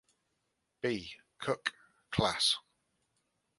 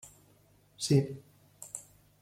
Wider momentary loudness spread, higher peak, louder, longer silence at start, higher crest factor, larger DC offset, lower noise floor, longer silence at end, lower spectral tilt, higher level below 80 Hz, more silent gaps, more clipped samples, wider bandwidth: second, 12 LU vs 22 LU; about the same, -14 dBFS vs -16 dBFS; about the same, -34 LUFS vs -32 LUFS; first, 0.85 s vs 0.05 s; about the same, 24 dB vs 20 dB; neither; first, -82 dBFS vs -64 dBFS; first, 1 s vs 0.4 s; second, -3.5 dB/octave vs -6 dB/octave; first, -62 dBFS vs -68 dBFS; neither; neither; second, 11.5 kHz vs 15.5 kHz